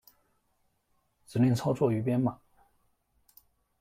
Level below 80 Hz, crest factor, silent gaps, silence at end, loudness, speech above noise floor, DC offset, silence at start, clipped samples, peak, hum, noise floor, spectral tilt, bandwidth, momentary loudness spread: -66 dBFS; 20 dB; none; 1.45 s; -29 LUFS; 47 dB; under 0.1%; 1.3 s; under 0.1%; -12 dBFS; none; -74 dBFS; -8 dB/octave; 15.5 kHz; 6 LU